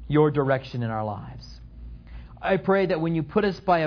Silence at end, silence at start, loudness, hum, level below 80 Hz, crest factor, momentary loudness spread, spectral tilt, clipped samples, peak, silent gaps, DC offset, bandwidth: 0 s; 0 s; -24 LUFS; none; -46 dBFS; 18 dB; 23 LU; -8.5 dB/octave; under 0.1%; -8 dBFS; none; under 0.1%; 5.4 kHz